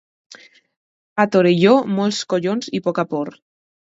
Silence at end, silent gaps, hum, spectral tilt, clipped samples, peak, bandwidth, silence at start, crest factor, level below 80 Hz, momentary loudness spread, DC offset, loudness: 0.65 s; 0.77-1.16 s; none; -6 dB/octave; under 0.1%; 0 dBFS; 8 kHz; 0.3 s; 18 dB; -66 dBFS; 11 LU; under 0.1%; -18 LUFS